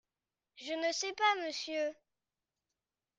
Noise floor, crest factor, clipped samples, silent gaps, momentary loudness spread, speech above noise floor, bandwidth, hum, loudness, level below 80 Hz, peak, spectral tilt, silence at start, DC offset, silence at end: under -90 dBFS; 22 dB; under 0.1%; none; 10 LU; over 55 dB; 9.6 kHz; none; -35 LUFS; -86 dBFS; -18 dBFS; 0.5 dB/octave; 0.55 s; under 0.1%; 1.25 s